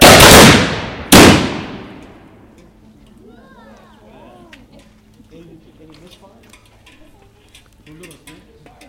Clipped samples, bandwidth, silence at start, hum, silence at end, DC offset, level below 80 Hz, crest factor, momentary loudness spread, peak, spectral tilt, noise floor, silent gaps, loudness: 1%; over 20 kHz; 0 s; none; 7.1 s; under 0.1%; -30 dBFS; 14 dB; 25 LU; 0 dBFS; -3.5 dB/octave; -46 dBFS; none; -6 LUFS